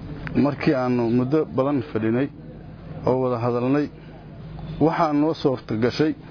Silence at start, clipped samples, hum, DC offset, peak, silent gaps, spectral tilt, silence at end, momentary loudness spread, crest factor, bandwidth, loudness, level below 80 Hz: 0 s; under 0.1%; none; under 0.1%; -6 dBFS; none; -8.5 dB/octave; 0 s; 18 LU; 16 dB; 5.4 kHz; -22 LUFS; -48 dBFS